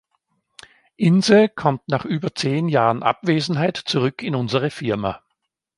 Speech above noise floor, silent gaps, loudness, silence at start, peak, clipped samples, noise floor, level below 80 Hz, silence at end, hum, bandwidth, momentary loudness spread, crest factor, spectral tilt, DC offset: 57 dB; none; -20 LUFS; 1 s; 0 dBFS; under 0.1%; -76 dBFS; -58 dBFS; 0.6 s; none; 11.5 kHz; 10 LU; 20 dB; -6 dB/octave; under 0.1%